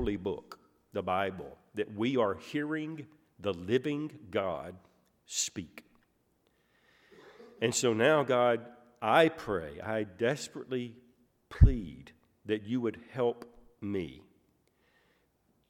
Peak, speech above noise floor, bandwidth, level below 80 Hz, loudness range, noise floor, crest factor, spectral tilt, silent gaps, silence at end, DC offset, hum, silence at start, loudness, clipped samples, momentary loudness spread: -8 dBFS; 42 dB; 16 kHz; -42 dBFS; 8 LU; -73 dBFS; 26 dB; -5 dB/octave; none; 1.5 s; under 0.1%; none; 0 s; -32 LUFS; under 0.1%; 18 LU